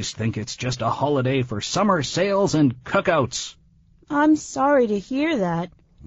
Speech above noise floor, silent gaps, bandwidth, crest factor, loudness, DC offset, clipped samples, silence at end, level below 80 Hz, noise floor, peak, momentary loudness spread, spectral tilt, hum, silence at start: 34 dB; none; 8 kHz; 18 dB; -22 LUFS; under 0.1%; under 0.1%; 0.4 s; -52 dBFS; -55 dBFS; -4 dBFS; 8 LU; -5 dB/octave; none; 0 s